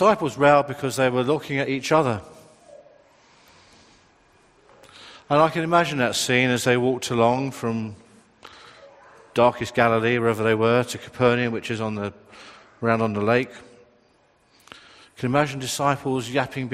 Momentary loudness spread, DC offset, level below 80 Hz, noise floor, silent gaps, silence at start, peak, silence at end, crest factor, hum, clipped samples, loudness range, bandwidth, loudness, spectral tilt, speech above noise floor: 9 LU; under 0.1%; -60 dBFS; -61 dBFS; none; 0 s; -2 dBFS; 0 s; 22 dB; none; under 0.1%; 6 LU; 15 kHz; -22 LUFS; -5 dB/octave; 39 dB